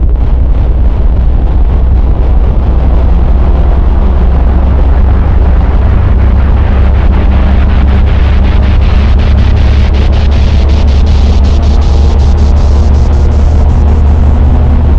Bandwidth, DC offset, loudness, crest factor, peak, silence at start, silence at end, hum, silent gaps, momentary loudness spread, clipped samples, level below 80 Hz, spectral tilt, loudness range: 6.4 kHz; 4%; -8 LUFS; 4 dB; 0 dBFS; 0 s; 0 s; none; none; 2 LU; under 0.1%; -6 dBFS; -8 dB/octave; 2 LU